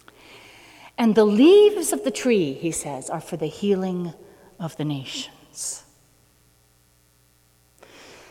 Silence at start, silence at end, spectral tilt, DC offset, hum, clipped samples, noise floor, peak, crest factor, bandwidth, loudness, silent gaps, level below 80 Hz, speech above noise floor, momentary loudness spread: 0.85 s; 2.5 s; -5 dB/octave; under 0.1%; none; under 0.1%; -60 dBFS; -6 dBFS; 18 dB; 16 kHz; -21 LUFS; none; -62 dBFS; 39 dB; 20 LU